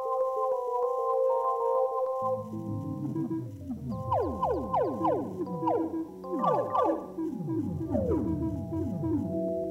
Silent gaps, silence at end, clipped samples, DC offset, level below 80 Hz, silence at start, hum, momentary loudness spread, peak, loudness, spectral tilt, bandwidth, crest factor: none; 0 s; under 0.1%; under 0.1%; -52 dBFS; 0 s; none; 8 LU; -14 dBFS; -30 LUFS; -9.5 dB/octave; 15.5 kHz; 14 dB